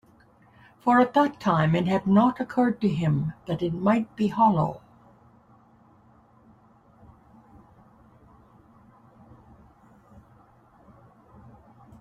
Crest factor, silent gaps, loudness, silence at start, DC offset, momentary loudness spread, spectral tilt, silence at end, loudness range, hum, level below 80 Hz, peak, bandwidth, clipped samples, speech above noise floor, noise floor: 20 dB; none; -23 LUFS; 0.85 s; under 0.1%; 9 LU; -8.5 dB/octave; 7.25 s; 6 LU; none; -60 dBFS; -8 dBFS; 8.2 kHz; under 0.1%; 35 dB; -57 dBFS